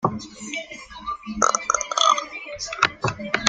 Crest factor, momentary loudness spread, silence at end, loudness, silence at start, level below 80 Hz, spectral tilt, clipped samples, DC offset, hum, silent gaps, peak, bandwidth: 24 dB; 15 LU; 0 s; -23 LUFS; 0 s; -52 dBFS; -2 dB/octave; under 0.1%; under 0.1%; none; none; 0 dBFS; 10.5 kHz